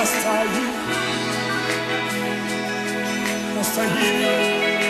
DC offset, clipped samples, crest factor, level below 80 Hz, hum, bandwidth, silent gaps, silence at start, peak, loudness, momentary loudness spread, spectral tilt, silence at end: under 0.1%; under 0.1%; 14 dB; -56 dBFS; none; 14 kHz; none; 0 s; -8 dBFS; -21 LUFS; 5 LU; -3 dB/octave; 0 s